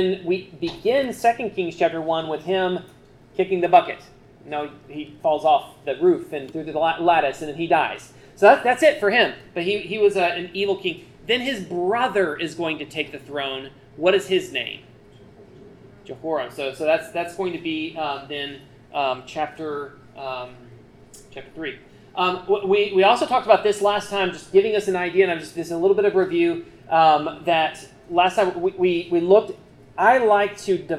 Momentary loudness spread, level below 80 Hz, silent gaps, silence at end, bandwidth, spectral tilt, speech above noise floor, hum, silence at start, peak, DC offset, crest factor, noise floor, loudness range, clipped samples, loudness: 16 LU; -58 dBFS; none; 0 s; 13 kHz; -5 dB/octave; 27 dB; none; 0 s; -2 dBFS; under 0.1%; 20 dB; -48 dBFS; 9 LU; under 0.1%; -21 LUFS